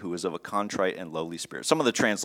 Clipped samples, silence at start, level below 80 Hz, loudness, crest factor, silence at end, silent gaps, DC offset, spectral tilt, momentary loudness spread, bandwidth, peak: under 0.1%; 0 s; -68 dBFS; -28 LUFS; 24 dB; 0 s; none; under 0.1%; -3.5 dB/octave; 10 LU; 17 kHz; -4 dBFS